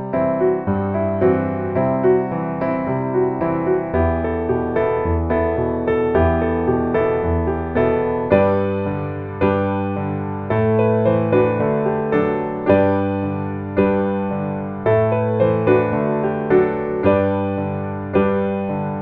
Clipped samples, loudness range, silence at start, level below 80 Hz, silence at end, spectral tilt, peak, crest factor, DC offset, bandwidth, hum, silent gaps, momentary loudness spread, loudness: under 0.1%; 2 LU; 0 s; -38 dBFS; 0 s; -11 dB/octave; -2 dBFS; 16 dB; under 0.1%; 4.5 kHz; none; none; 6 LU; -19 LUFS